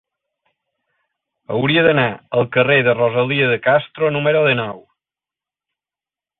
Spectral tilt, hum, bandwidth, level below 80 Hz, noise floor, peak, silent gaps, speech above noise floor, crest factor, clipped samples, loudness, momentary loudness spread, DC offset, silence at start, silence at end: -10.5 dB/octave; none; 4.2 kHz; -58 dBFS; under -90 dBFS; -2 dBFS; none; over 74 dB; 18 dB; under 0.1%; -16 LUFS; 7 LU; under 0.1%; 1.5 s; 1.6 s